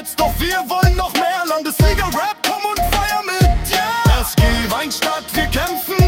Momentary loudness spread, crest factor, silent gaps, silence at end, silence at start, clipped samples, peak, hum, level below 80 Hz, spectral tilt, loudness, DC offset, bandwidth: 4 LU; 14 dB; none; 0 s; 0 s; under 0.1%; -2 dBFS; none; -22 dBFS; -4.5 dB/octave; -17 LUFS; under 0.1%; 18 kHz